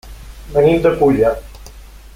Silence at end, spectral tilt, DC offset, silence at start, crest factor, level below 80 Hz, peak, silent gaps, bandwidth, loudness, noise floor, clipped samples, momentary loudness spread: 0.2 s; -7.5 dB/octave; under 0.1%; 0.05 s; 14 dB; -34 dBFS; -2 dBFS; none; 16 kHz; -14 LUFS; -37 dBFS; under 0.1%; 7 LU